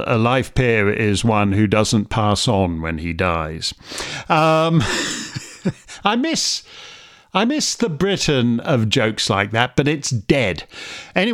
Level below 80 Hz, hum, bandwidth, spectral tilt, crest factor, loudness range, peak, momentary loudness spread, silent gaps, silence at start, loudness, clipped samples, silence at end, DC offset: -42 dBFS; none; 15.5 kHz; -4.5 dB/octave; 18 dB; 2 LU; 0 dBFS; 10 LU; none; 0 s; -19 LUFS; under 0.1%; 0 s; under 0.1%